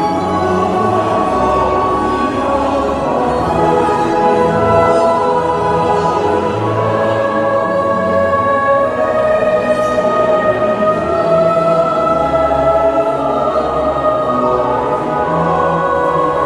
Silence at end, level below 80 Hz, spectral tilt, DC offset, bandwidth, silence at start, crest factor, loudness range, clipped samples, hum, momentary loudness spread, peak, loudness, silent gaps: 0 s; -38 dBFS; -6.5 dB/octave; under 0.1%; 11.5 kHz; 0 s; 12 dB; 1 LU; under 0.1%; none; 3 LU; 0 dBFS; -13 LUFS; none